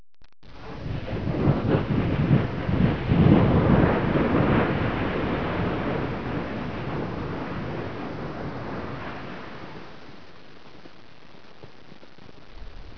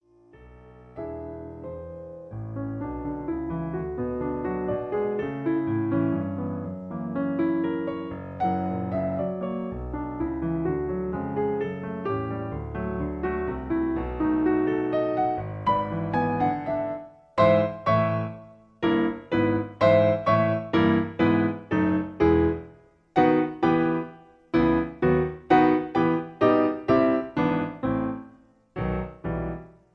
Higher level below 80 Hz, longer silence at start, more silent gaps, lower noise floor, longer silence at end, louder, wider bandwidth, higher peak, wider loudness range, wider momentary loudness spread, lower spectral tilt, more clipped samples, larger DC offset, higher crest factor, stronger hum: first, -38 dBFS vs -46 dBFS; second, 0.2 s vs 0.35 s; neither; about the same, -50 dBFS vs -53 dBFS; second, 0 s vs 0.25 s; about the same, -25 LUFS vs -26 LUFS; about the same, 5.4 kHz vs 5.8 kHz; first, -4 dBFS vs -8 dBFS; first, 17 LU vs 7 LU; first, 20 LU vs 13 LU; about the same, -9.5 dB/octave vs -9.5 dB/octave; neither; first, 0.9% vs under 0.1%; about the same, 22 dB vs 18 dB; neither